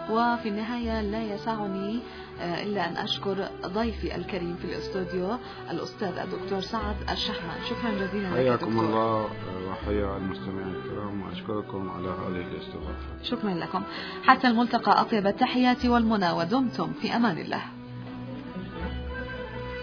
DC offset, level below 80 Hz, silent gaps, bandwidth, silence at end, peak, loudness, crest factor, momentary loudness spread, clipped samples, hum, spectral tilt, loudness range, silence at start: under 0.1%; -44 dBFS; none; 5.4 kHz; 0 s; -2 dBFS; -28 LUFS; 26 dB; 13 LU; under 0.1%; none; -6.5 dB/octave; 9 LU; 0 s